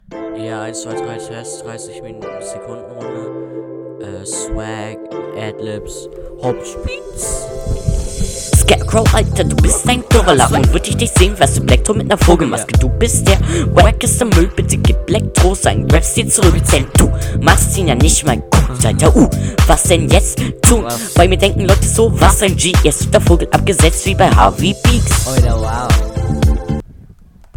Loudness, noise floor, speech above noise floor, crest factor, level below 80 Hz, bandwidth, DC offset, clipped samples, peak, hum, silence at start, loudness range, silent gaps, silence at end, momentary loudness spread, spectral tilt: -12 LUFS; -41 dBFS; 29 dB; 12 dB; -18 dBFS; 18.5 kHz; under 0.1%; 0.3%; 0 dBFS; none; 0.1 s; 14 LU; none; 0.6 s; 16 LU; -4.5 dB/octave